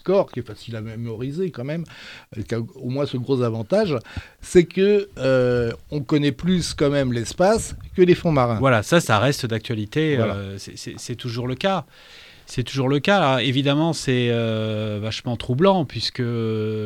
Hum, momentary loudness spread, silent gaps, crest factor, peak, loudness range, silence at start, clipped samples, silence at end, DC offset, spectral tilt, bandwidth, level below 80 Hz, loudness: none; 13 LU; none; 20 dB; -2 dBFS; 6 LU; 0.05 s; under 0.1%; 0 s; under 0.1%; -6 dB/octave; 15 kHz; -46 dBFS; -21 LUFS